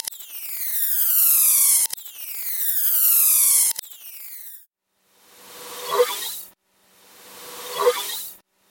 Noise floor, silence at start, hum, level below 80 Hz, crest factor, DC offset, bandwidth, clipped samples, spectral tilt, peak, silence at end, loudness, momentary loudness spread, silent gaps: -67 dBFS; 0.05 s; none; -80 dBFS; 20 dB; under 0.1%; 17 kHz; under 0.1%; 2.5 dB/octave; -2 dBFS; 0.35 s; -17 LUFS; 22 LU; none